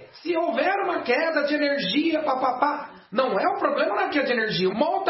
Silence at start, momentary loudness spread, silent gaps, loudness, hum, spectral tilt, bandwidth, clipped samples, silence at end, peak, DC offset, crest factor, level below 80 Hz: 0 s; 3 LU; none; -23 LUFS; none; -8 dB/octave; 6 kHz; under 0.1%; 0 s; -8 dBFS; under 0.1%; 16 dB; -70 dBFS